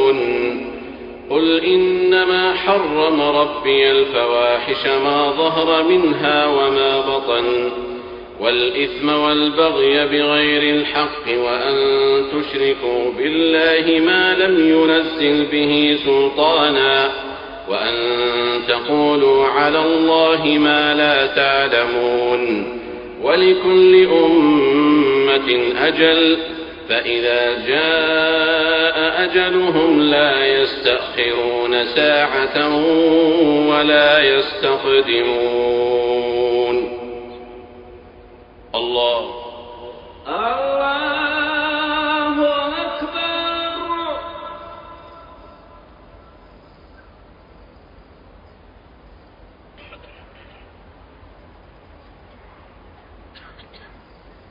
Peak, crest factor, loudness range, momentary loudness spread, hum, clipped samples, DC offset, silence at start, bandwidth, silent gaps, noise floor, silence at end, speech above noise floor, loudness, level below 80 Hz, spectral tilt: 0 dBFS; 16 dB; 8 LU; 10 LU; none; under 0.1%; under 0.1%; 0 s; 5.4 kHz; none; -46 dBFS; 4.55 s; 30 dB; -15 LUFS; -50 dBFS; -7 dB/octave